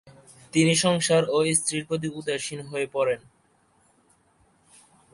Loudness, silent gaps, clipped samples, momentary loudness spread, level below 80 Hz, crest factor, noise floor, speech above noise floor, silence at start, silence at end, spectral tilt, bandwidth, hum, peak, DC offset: -24 LUFS; none; under 0.1%; 10 LU; -64 dBFS; 20 dB; -64 dBFS; 40 dB; 0.05 s; 1.95 s; -4 dB/octave; 11.5 kHz; none; -6 dBFS; under 0.1%